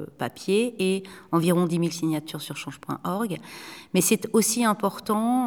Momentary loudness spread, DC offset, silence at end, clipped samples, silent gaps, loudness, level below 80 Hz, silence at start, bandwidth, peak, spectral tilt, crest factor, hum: 12 LU; under 0.1%; 0 s; under 0.1%; none; -25 LUFS; -68 dBFS; 0 s; over 20 kHz; -8 dBFS; -4.5 dB/octave; 18 dB; none